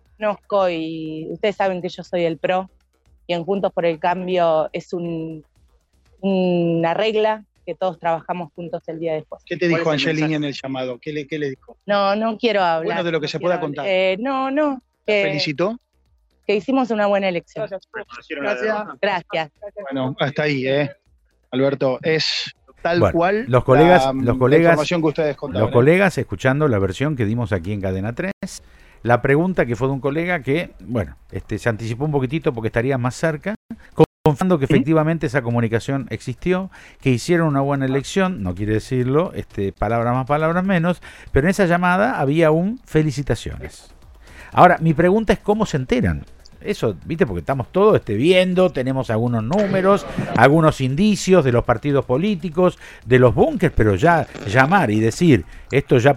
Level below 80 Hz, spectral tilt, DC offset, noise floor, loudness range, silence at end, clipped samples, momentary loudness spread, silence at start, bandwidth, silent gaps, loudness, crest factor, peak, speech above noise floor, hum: -40 dBFS; -6.5 dB/octave; under 0.1%; -61 dBFS; 6 LU; 0 s; under 0.1%; 13 LU; 0.2 s; 14 kHz; 28.33-28.41 s, 33.56-33.69 s, 34.06-34.24 s; -19 LUFS; 18 dB; 0 dBFS; 43 dB; none